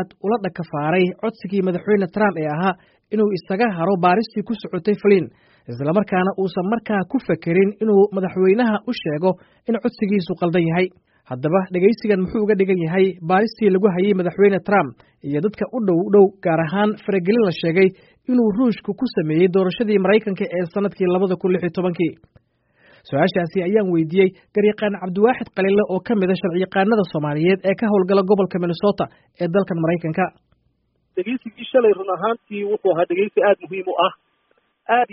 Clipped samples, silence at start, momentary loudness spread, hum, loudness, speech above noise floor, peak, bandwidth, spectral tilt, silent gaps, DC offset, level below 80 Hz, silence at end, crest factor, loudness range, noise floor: under 0.1%; 0 s; 8 LU; none; -19 LUFS; 48 dB; -2 dBFS; 5.8 kHz; -6 dB/octave; none; under 0.1%; -58 dBFS; 0.1 s; 16 dB; 3 LU; -66 dBFS